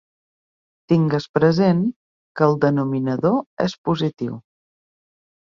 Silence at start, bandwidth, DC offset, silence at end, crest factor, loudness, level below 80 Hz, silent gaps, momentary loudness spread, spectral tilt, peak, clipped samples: 0.9 s; 7.2 kHz; under 0.1%; 1.1 s; 18 dB; -20 LUFS; -58 dBFS; 1.29-1.34 s, 1.96-2.35 s, 3.46-3.57 s, 3.78-3.84 s; 11 LU; -8 dB/octave; -2 dBFS; under 0.1%